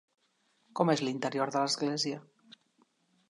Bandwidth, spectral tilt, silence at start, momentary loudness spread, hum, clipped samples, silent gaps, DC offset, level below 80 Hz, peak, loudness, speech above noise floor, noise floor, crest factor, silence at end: 11.5 kHz; -4.5 dB/octave; 0.75 s; 9 LU; none; under 0.1%; none; under 0.1%; -82 dBFS; -12 dBFS; -31 LUFS; 42 dB; -73 dBFS; 22 dB; 1.1 s